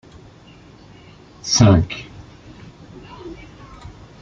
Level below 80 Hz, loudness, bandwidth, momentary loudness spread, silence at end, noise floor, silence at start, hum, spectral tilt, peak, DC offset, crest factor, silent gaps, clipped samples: -42 dBFS; -16 LUFS; 7.6 kHz; 29 LU; 0.3 s; -45 dBFS; 1.45 s; none; -5 dB/octave; -2 dBFS; under 0.1%; 20 dB; none; under 0.1%